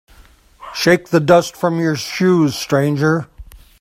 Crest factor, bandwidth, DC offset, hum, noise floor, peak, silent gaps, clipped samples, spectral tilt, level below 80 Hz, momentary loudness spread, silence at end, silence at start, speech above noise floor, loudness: 16 dB; 16 kHz; under 0.1%; none; -47 dBFS; 0 dBFS; none; under 0.1%; -5.5 dB/octave; -46 dBFS; 7 LU; 0.25 s; 0.6 s; 32 dB; -16 LUFS